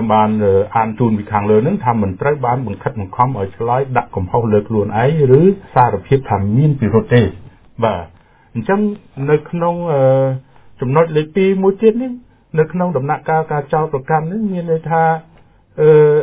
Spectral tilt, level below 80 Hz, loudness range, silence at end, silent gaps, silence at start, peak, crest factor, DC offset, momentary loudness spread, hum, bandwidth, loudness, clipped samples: -12 dB/octave; -40 dBFS; 4 LU; 0 s; none; 0 s; 0 dBFS; 14 dB; under 0.1%; 8 LU; none; 4 kHz; -15 LUFS; under 0.1%